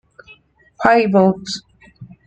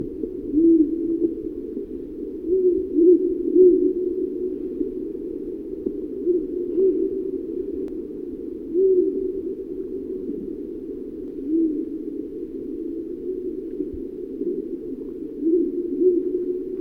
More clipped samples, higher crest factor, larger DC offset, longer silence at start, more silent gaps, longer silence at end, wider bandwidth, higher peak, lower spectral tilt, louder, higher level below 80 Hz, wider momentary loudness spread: neither; about the same, 16 dB vs 18 dB; neither; first, 0.8 s vs 0 s; neither; first, 0.2 s vs 0 s; first, 8.8 kHz vs 1.4 kHz; first, -2 dBFS vs -6 dBFS; second, -6 dB/octave vs -11 dB/octave; first, -15 LUFS vs -24 LUFS; about the same, -54 dBFS vs -50 dBFS; about the same, 15 LU vs 15 LU